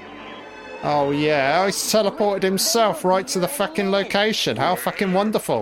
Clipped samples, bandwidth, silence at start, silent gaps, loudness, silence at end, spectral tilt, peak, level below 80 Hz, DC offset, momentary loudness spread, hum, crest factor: under 0.1%; 17 kHz; 0 s; none; -20 LUFS; 0 s; -3.5 dB/octave; -6 dBFS; -58 dBFS; under 0.1%; 10 LU; none; 14 dB